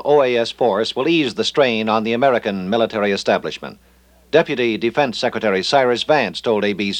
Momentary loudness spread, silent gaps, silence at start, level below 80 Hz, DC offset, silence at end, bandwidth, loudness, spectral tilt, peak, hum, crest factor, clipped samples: 4 LU; none; 0 s; -56 dBFS; under 0.1%; 0 s; 10.5 kHz; -18 LUFS; -5 dB/octave; 0 dBFS; none; 18 dB; under 0.1%